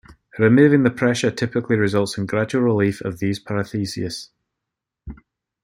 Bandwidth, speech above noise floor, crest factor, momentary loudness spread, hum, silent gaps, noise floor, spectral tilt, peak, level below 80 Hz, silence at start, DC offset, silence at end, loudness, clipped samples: 15.5 kHz; 64 dB; 18 dB; 12 LU; none; none; -83 dBFS; -6.5 dB/octave; -2 dBFS; -52 dBFS; 0.1 s; under 0.1%; 0.5 s; -20 LUFS; under 0.1%